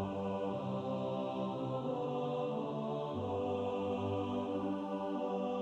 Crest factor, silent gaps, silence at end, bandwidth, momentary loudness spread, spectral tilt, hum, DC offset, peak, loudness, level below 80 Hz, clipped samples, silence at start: 12 dB; none; 0 s; 8.4 kHz; 2 LU; -8 dB/octave; none; under 0.1%; -26 dBFS; -38 LUFS; -72 dBFS; under 0.1%; 0 s